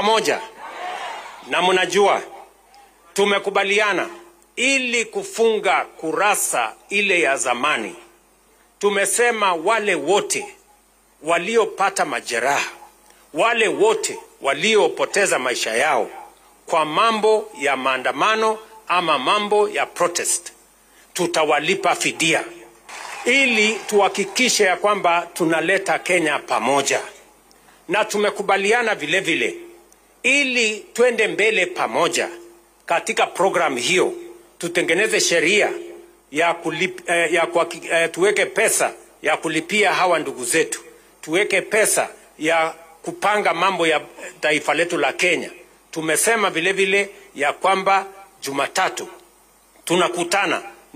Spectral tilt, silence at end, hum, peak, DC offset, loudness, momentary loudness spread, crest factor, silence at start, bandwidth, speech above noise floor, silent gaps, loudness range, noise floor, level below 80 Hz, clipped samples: -2 dB/octave; 0.2 s; none; -6 dBFS; under 0.1%; -19 LUFS; 11 LU; 14 dB; 0 s; 15.5 kHz; 36 dB; none; 3 LU; -56 dBFS; -66 dBFS; under 0.1%